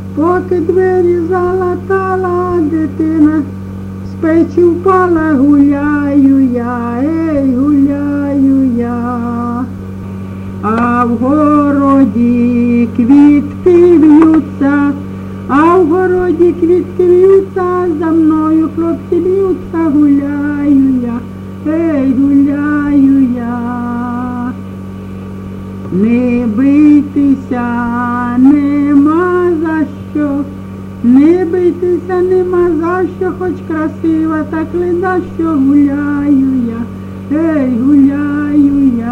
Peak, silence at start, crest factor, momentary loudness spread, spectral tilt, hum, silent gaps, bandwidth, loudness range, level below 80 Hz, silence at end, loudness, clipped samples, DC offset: 0 dBFS; 0 s; 10 dB; 11 LU; -9 dB/octave; none; none; 6 kHz; 5 LU; -40 dBFS; 0 s; -11 LUFS; under 0.1%; under 0.1%